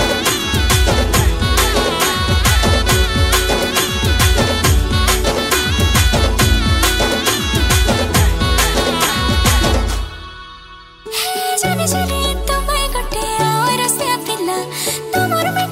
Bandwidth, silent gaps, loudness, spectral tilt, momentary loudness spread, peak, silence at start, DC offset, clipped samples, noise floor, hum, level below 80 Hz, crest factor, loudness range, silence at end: 16.5 kHz; none; -15 LUFS; -3.5 dB/octave; 6 LU; 0 dBFS; 0 s; under 0.1%; under 0.1%; -38 dBFS; none; -20 dBFS; 14 dB; 4 LU; 0 s